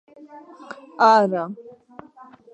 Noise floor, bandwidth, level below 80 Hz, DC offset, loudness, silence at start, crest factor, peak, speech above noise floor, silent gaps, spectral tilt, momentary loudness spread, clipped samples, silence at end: -47 dBFS; 8.8 kHz; -78 dBFS; under 0.1%; -18 LUFS; 0.2 s; 20 dB; -4 dBFS; 27 dB; none; -5.5 dB/octave; 25 LU; under 0.1%; 0.95 s